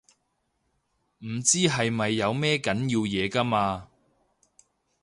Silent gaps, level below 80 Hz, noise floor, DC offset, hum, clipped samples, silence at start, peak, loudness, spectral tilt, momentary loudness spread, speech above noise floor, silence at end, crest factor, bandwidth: none; -58 dBFS; -75 dBFS; under 0.1%; none; under 0.1%; 1.2 s; -8 dBFS; -25 LUFS; -3.5 dB/octave; 9 LU; 49 dB; 1.15 s; 20 dB; 11.5 kHz